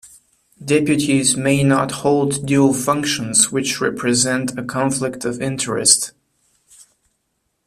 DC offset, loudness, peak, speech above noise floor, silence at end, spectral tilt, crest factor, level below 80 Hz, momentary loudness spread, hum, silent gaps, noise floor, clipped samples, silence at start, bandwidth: under 0.1%; -17 LUFS; 0 dBFS; 53 dB; 1.55 s; -3.5 dB/octave; 18 dB; -54 dBFS; 8 LU; none; none; -71 dBFS; under 0.1%; 0.05 s; 14.5 kHz